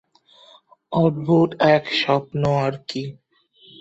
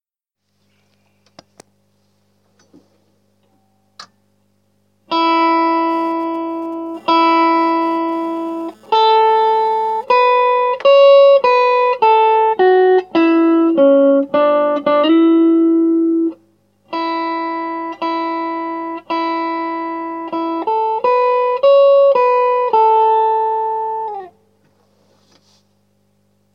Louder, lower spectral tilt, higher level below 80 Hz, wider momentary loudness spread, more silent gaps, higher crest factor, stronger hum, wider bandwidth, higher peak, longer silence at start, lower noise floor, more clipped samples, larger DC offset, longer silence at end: second, -20 LUFS vs -14 LUFS; first, -7 dB/octave vs -5.5 dB/octave; first, -56 dBFS vs -74 dBFS; about the same, 13 LU vs 12 LU; neither; first, 20 dB vs 14 dB; second, none vs 50 Hz at -60 dBFS; first, 8 kHz vs 6.6 kHz; about the same, -2 dBFS vs -2 dBFS; second, 0.9 s vs 4 s; second, -55 dBFS vs -76 dBFS; neither; neither; second, 0.7 s vs 2.25 s